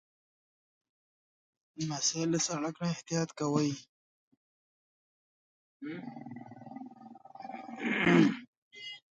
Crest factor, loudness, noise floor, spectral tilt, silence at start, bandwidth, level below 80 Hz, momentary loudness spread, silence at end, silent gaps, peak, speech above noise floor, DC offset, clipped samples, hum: 24 dB; -31 LUFS; -52 dBFS; -4 dB/octave; 1.75 s; 9.4 kHz; -74 dBFS; 22 LU; 0.2 s; 3.89-4.31 s, 4.37-5.80 s, 8.48-8.71 s; -12 dBFS; 21 dB; under 0.1%; under 0.1%; none